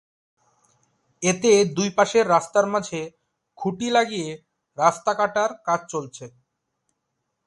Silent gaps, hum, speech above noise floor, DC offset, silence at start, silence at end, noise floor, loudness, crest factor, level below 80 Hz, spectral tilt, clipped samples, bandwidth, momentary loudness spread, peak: none; none; 56 dB; under 0.1%; 1.2 s; 1.2 s; -78 dBFS; -22 LUFS; 20 dB; -66 dBFS; -4 dB/octave; under 0.1%; 11.5 kHz; 16 LU; -4 dBFS